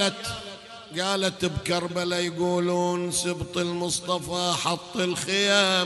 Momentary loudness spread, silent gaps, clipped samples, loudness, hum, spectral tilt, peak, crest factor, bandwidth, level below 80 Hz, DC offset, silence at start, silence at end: 9 LU; none; under 0.1%; -25 LUFS; none; -3.5 dB/octave; -6 dBFS; 20 dB; 12.5 kHz; -54 dBFS; under 0.1%; 0 s; 0 s